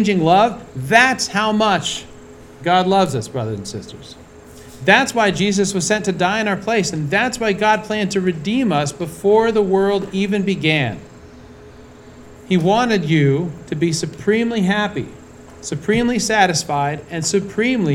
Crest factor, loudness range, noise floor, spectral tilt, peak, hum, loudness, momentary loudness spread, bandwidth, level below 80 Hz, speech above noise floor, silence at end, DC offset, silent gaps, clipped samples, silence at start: 18 dB; 3 LU; -40 dBFS; -4.5 dB/octave; 0 dBFS; none; -17 LUFS; 11 LU; 16 kHz; -48 dBFS; 23 dB; 0 s; under 0.1%; none; under 0.1%; 0 s